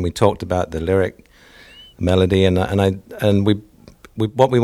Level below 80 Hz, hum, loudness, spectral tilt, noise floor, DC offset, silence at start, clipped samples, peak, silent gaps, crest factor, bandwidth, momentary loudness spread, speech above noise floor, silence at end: -40 dBFS; none; -18 LUFS; -7 dB/octave; -46 dBFS; under 0.1%; 0 s; under 0.1%; 0 dBFS; none; 18 dB; 13.5 kHz; 9 LU; 29 dB; 0 s